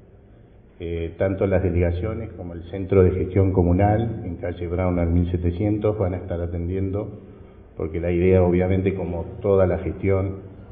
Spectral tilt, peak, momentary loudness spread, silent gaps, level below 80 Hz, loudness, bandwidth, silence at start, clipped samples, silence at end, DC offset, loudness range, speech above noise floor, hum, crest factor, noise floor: -13.5 dB/octave; -4 dBFS; 13 LU; none; -32 dBFS; -22 LUFS; 3.8 kHz; 0.8 s; under 0.1%; 0 s; under 0.1%; 3 LU; 27 dB; none; 18 dB; -49 dBFS